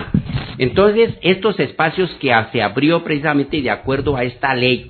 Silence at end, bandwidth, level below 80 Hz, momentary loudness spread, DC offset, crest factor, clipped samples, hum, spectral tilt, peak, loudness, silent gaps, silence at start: 0 s; 4.6 kHz; -40 dBFS; 6 LU; under 0.1%; 16 dB; under 0.1%; none; -9 dB/octave; 0 dBFS; -17 LUFS; none; 0 s